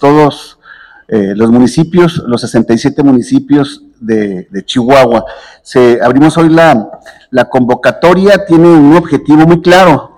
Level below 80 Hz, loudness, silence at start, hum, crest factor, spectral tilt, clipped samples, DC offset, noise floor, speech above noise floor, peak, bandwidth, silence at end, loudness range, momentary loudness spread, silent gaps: -40 dBFS; -7 LUFS; 0 s; none; 8 dB; -6.5 dB/octave; 10%; under 0.1%; -36 dBFS; 29 dB; 0 dBFS; 14 kHz; 0.1 s; 4 LU; 10 LU; none